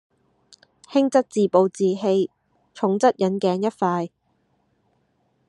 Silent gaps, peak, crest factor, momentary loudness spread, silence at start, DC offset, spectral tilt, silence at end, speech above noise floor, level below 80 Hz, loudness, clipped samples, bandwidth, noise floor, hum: none; -4 dBFS; 20 dB; 7 LU; 0.9 s; under 0.1%; -6.5 dB/octave; 1.4 s; 47 dB; -72 dBFS; -21 LUFS; under 0.1%; 10.5 kHz; -67 dBFS; none